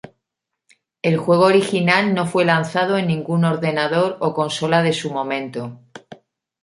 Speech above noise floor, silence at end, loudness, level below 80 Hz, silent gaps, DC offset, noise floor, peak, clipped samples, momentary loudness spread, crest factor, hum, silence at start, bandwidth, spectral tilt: 63 dB; 0.5 s; -18 LUFS; -64 dBFS; none; under 0.1%; -81 dBFS; -2 dBFS; under 0.1%; 9 LU; 18 dB; none; 1.05 s; 11.5 kHz; -6 dB/octave